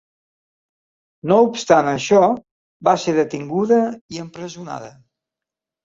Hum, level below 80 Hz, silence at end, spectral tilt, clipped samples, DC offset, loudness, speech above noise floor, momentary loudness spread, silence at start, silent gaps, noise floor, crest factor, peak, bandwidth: none; -62 dBFS; 0.95 s; -5.5 dB/octave; under 0.1%; under 0.1%; -17 LUFS; 69 dB; 17 LU; 1.25 s; 2.51-2.80 s, 4.01-4.09 s; -87 dBFS; 20 dB; 0 dBFS; 7.8 kHz